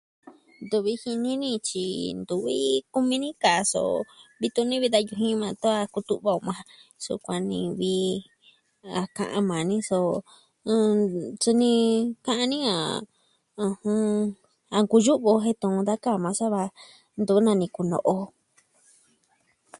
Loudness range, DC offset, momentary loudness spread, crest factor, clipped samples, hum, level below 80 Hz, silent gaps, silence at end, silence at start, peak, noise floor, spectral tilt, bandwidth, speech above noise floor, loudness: 4 LU; under 0.1%; 10 LU; 20 dB; under 0.1%; none; -66 dBFS; none; 1.5 s; 0.25 s; -6 dBFS; -68 dBFS; -4.5 dB/octave; 11.5 kHz; 43 dB; -25 LUFS